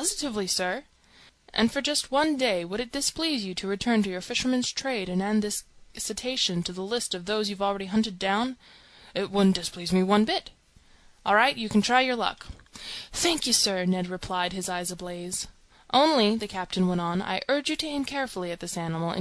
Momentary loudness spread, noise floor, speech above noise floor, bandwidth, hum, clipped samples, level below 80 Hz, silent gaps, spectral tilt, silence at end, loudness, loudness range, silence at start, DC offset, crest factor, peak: 11 LU; -57 dBFS; 30 dB; 14 kHz; none; under 0.1%; -54 dBFS; none; -3.5 dB/octave; 0 s; -26 LUFS; 3 LU; 0 s; under 0.1%; 20 dB; -8 dBFS